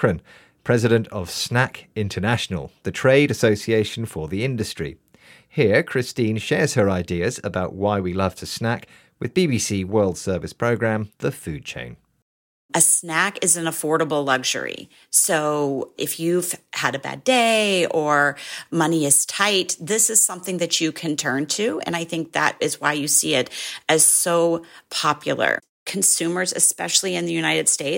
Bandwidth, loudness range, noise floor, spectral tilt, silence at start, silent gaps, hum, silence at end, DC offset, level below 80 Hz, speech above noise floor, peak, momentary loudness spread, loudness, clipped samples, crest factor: 17 kHz; 5 LU; -51 dBFS; -3 dB/octave; 0 s; 12.22-12.69 s, 25.69-25.86 s; none; 0 s; under 0.1%; -58 dBFS; 30 dB; -2 dBFS; 11 LU; -20 LUFS; under 0.1%; 20 dB